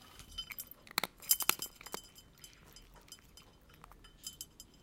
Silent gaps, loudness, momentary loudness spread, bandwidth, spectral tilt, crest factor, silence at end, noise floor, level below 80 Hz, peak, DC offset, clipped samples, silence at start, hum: none; -37 LUFS; 27 LU; 17 kHz; 0 dB/octave; 38 dB; 0.15 s; -60 dBFS; -64 dBFS; -6 dBFS; under 0.1%; under 0.1%; 0 s; none